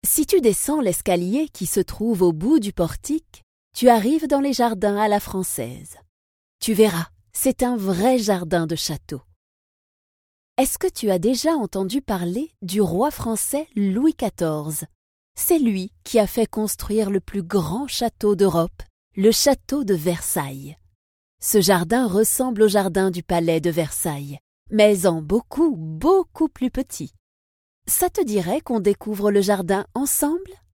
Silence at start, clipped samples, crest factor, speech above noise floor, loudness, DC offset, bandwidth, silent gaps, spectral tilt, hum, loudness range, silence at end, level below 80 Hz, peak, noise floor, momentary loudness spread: 0.05 s; under 0.1%; 20 dB; over 70 dB; -21 LUFS; under 0.1%; 17.5 kHz; 3.43-3.71 s, 6.09-6.59 s, 9.36-10.56 s, 14.95-15.35 s, 18.90-19.11 s, 20.95-21.38 s, 24.40-24.66 s, 27.19-27.82 s; -4.5 dB/octave; none; 3 LU; 0.25 s; -46 dBFS; 0 dBFS; under -90 dBFS; 11 LU